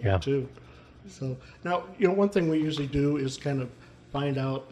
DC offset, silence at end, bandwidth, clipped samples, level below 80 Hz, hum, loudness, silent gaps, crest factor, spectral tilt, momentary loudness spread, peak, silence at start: under 0.1%; 0 s; 11.5 kHz; under 0.1%; -50 dBFS; none; -28 LUFS; none; 18 dB; -7 dB/octave; 12 LU; -10 dBFS; 0 s